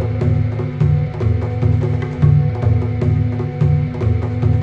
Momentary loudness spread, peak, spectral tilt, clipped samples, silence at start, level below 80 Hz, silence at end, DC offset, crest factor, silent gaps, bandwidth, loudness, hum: 4 LU; 0 dBFS; -10 dB/octave; under 0.1%; 0 s; -30 dBFS; 0 s; 0.5%; 14 dB; none; 4.9 kHz; -17 LUFS; none